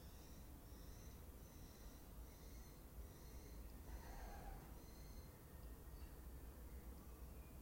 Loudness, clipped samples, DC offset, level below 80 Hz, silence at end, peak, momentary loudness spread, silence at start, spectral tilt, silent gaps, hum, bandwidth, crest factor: -59 LUFS; under 0.1%; under 0.1%; -58 dBFS; 0 s; -42 dBFS; 3 LU; 0 s; -5 dB/octave; none; none; 16.5 kHz; 14 dB